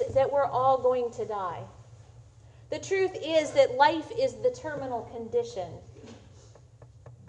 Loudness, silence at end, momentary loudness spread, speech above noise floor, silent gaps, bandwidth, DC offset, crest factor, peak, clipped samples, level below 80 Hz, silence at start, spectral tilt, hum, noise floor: -28 LUFS; 0 s; 17 LU; 26 dB; none; 9.4 kHz; under 0.1%; 22 dB; -8 dBFS; under 0.1%; -60 dBFS; 0 s; -4.5 dB/octave; none; -53 dBFS